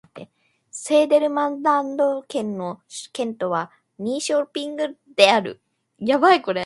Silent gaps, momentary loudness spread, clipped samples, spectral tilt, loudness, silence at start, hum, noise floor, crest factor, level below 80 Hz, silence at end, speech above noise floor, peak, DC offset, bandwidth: none; 16 LU; under 0.1%; -3.5 dB/octave; -21 LUFS; 0.15 s; none; -55 dBFS; 20 dB; -72 dBFS; 0 s; 35 dB; 0 dBFS; under 0.1%; 11.5 kHz